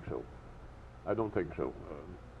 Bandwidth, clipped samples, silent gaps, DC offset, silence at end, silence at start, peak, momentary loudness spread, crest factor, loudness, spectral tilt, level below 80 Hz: 9 kHz; under 0.1%; none; under 0.1%; 0 s; 0 s; -18 dBFS; 19 LU; 20 dB; -38 LUFS; -9 dB/octave; -52 dBFS